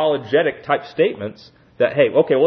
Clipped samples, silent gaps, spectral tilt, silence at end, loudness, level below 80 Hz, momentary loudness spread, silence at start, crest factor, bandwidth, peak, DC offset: under 0.1%; none; -8 dB/octave; 0 s; -18 LUFS; -64 dBFS; 9 LU; 0 s; 16 dB; 6 kHz; -2 dBFS; under 0.1%